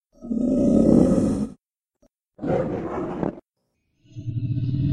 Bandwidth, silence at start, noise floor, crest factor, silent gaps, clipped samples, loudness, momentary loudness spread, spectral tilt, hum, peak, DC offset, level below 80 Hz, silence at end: 10.5 kHz; 0.2 s; -75 dBFS; 20 dB; none; under 0.1%; -23 LUFS; 15 LU; -9 dB/octave; none; -2 dBFS; under 0.1%; -42 dBFS; 0 s